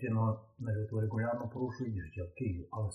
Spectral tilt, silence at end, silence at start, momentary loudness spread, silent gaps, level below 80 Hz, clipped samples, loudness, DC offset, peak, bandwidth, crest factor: -9 dB/octave; 0 s; 0 s; 7 LU; none; -62 dBFS; under 0.1%; -37 LUFS; under 0.1%; -22 dBFS; 6.4 kHz; 14 dB